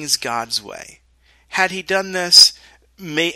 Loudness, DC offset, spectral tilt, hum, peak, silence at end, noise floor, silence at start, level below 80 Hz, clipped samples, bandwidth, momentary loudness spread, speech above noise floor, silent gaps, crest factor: -14 LUFS; under 0.1%; -0.5 dB/octave; none; 0 dBFS; 0 s; -52 dBFS; 0 s; -56 dBFS; 0.1%; 13.5 kHz; 17 LU; 35 dB; none; 18 dB